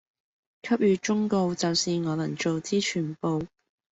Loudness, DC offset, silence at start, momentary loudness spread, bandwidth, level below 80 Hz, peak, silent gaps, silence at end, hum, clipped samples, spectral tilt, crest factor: -26 LUFS; under 0.1%; 0.65 s; 6 LU; 8.2 kHz; -64 dBFS; -12 dBFS; none; 0.45 s; none; under 0.1%; -5 dB/octave; 14 dB